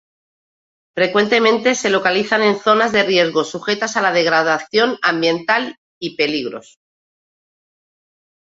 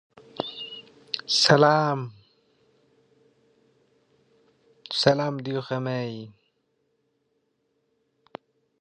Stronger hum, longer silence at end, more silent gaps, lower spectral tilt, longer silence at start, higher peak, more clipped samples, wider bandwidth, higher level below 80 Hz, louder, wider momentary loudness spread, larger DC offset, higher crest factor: neither; second, 1.85 s vs 2.5 s; first, 5.78-6.01 s vs none; about the same, -3.5 dB/octave vs -4.5 dB/octave; first, 0.95 s vs 0.4 s; about the same, -2 dBFS vs -2 dBFS; neither; second, 8 kHz vs 10.5 kHz; first, -62 dBFS vs -68 dBFS; first, -16 LUFS vs -24 LUFS; second, 10 LU vs 28 LU; neither; second, 18 dB vs 26 dB